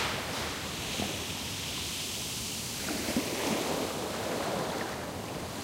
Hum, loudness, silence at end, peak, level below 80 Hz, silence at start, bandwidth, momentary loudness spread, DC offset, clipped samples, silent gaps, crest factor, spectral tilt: none; -33 LUFS; 0 s; -16 dBFS; -54 dBFS; 0 s; 16 kHz; 4 LU; under 0.1%; under 0.1%; none; 20 dB; -3 dB/octave